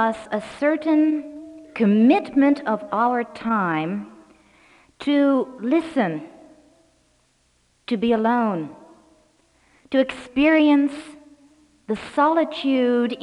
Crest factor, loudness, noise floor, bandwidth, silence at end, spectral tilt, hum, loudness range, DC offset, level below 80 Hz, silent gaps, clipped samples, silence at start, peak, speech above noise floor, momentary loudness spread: 16 dB; -21 LUFS; -63 dBFS; 10.5 kHz; 0 s; -7 dB/octave; none; 5 LU; under 0.1%; -60 dBFS; none; under 0.1%; 0 s; -6 dBFS; 44 dB; 13 LU